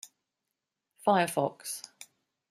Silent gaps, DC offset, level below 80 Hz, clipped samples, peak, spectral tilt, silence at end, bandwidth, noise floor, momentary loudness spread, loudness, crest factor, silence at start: none; under 0.1%; -80 dBFS; under 0.1%; -12 dBFS; -4 dB/octave; 0.45 s; 15.5 kHz; -86 dBFS; 20 LU; -30 LUFS; 22 dB; 0.05 s